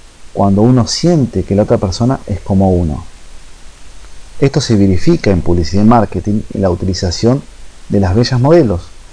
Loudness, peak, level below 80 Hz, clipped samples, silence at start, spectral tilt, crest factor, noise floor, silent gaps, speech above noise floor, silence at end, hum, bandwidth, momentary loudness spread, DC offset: -12 LUFS; 0 dBFS; -30 dBFS; under 0.1%; 0 s; -7 dB/octave; 12 dB; -30 dBFS; none; 20 dB; 0.1 s; none; 10.5 kHz; 8 LU; under 0.1%